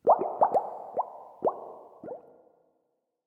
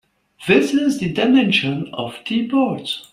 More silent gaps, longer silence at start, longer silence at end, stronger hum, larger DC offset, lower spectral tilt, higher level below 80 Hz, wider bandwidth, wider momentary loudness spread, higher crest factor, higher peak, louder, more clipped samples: neither; second, 0.05 s vs 0.4 s; first, 1.05 s vs 0.1 s; neither; neither; first, -8.5 dB/octave vs -5.5 dB/octave; second, -76 dBFS vs -56 dBFS; second, 9.4 kHz vs 13 kHz; first, 21 LU vs 11 LU; about the same, 20 dB vs 18 dB; second, -10 dBFS vs -2 dBFS; second, -29 LUFS vs -18 LUFS; neither